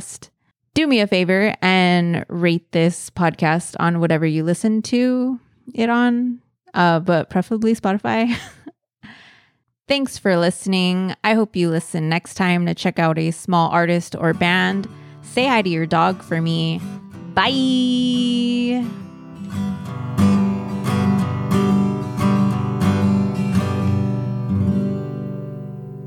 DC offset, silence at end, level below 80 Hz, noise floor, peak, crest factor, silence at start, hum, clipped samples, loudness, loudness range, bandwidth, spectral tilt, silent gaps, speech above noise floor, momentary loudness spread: under 0.1%; 0 s; -54 dBFS; -62 dBFS; -4 dBFS; 16 dB; 0 s; none; under 0.1%; -19 LUFS; 3 LU; 13.5 kHz; -6 dB/octave; none; 44 dB; 10 LU